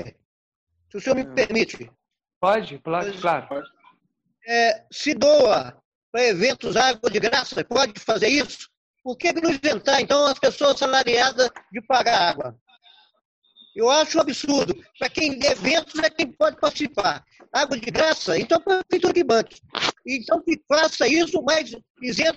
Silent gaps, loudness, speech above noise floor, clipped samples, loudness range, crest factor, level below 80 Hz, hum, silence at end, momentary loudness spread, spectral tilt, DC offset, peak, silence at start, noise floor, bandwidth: 0.25-0.67 s, 2.36-2.41 s, 5.85-6.13 s, 8.77-8.94 s, 12.61-12.66 s, 13.25-13.42 s, 21.90-21.95 s; -21 LUFS; 49 dB; under 0.1%; 5 LU; 16 dB; -58 dBFS; none; 0 s; 11 LU; -3 dB/octave; under 0.1%; -6 dBFS; 0 s; -70 dBFS; 8.4 kHz